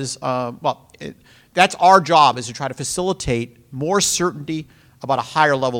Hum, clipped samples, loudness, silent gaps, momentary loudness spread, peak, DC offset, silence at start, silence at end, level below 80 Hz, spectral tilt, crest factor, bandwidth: none; under 0.1%; -18 LUFS; none; 19 LU; 0 dBFS; under 0.1%; 0 s; 0 s; -48 dBFS; -3.5 dB/octave; 20 dB; 17 kHz